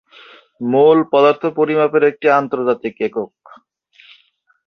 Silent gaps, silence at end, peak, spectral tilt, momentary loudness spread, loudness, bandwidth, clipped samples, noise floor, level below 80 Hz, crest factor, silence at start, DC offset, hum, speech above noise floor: none; 1.4 s; -2 dBFS; -7.5 dB/octave; 11 LU; -15 LUFS; 6.2 kHz; under 0.1%; -57 dBFS; -64 dBFS; 16 dB; 0.6 s; under 0.1%; none; 42 dB